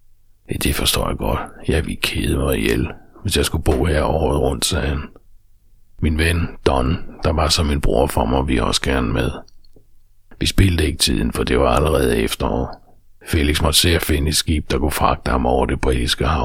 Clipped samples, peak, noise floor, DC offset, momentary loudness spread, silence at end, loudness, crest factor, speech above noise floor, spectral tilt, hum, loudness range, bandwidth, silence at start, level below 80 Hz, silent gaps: under 0.1%; 0 dBFS; -48 dBFS; under 0.1%; 7 LU; 0 s; -19 LUFS; 18 dB; 30 dB; -4.5 dB/octave; none; 3 LU; 17 kHz; 0.5 s; -26 dBFS; none